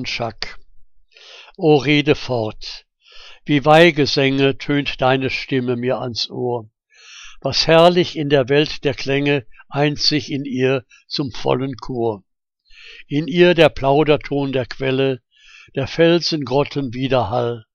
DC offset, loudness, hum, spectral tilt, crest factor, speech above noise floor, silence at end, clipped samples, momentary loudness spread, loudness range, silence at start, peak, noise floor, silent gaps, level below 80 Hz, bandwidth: under 0.1%; -17 LUFS; none; -5.5 dB/octave; 18 dB; 34 dB; 0.15 s; under 0.1%; 14 LU; 4 LU; 0 s; 0 dBFS; -51 dBFS; none; -42 dBFS; 10.5 kHz